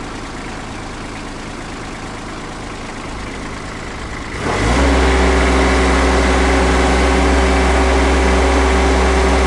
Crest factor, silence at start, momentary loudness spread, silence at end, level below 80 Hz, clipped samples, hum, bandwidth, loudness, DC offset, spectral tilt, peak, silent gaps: 10 dB; 0 s; 14 LU; 0 s; -18 dBFS; under 0.1%; none; 11.5 kHz; -14 LUFS; under 0.1%; -5 dB/octave; -4 dBFS; none